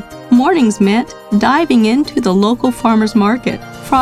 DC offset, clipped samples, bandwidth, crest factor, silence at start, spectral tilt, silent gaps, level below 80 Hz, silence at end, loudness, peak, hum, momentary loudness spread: under 0.1%; under 0.1%; 14 kHz; 12 dB; 0 s; -6 dB/octave; none; -44 dBFS; 0 s; -13 LUFS; 0 dBFS; none; 6 LU